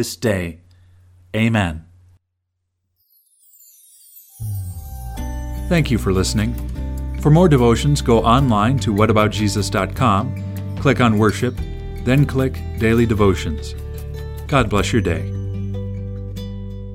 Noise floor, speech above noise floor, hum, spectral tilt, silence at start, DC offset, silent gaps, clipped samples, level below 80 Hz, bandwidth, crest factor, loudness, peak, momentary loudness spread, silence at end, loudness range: -74 dBFS; 58 dB; none; -6.5 dB/octave; 0 s; under 0.1%; none; under 0.1%; -30 dBFS; 16.5 kHz; 18 dB; -18 LUFS; 0 dBFS; 15 LU; 0 s; 11 LU